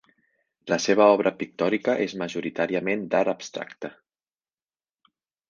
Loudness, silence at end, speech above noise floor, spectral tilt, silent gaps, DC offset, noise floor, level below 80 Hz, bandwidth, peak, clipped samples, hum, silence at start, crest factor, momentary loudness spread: -24 LUFS; 1.6 s; over 66 dB; -4.5 dB/octave; none; under 0.1%; under -90 dBFS; -70 dBFS; 7.4 kHz; -4 dBFS; under 0.1%; none; 0.65 s; 22 dB; 17 LU